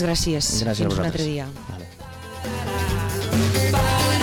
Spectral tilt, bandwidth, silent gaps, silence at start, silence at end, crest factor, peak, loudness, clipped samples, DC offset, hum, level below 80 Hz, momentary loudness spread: -4.5 dB/octave; 19 kHz; none; 0 s; 0 s; 10 dB; -14 dBFS; -22 LUFS; under 0.1%; under 0.1%; none; -36 dBFS; 17 LU